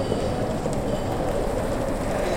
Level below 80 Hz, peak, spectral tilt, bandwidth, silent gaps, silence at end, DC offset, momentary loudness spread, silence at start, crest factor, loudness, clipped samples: -34 dBFS; -8 dBFS; -6 dB/octave; 16.5 kHz; none; 0 s; under 0.1%; 1 LU; 0 s; 16 dB; -26 LUFS; under 0.1%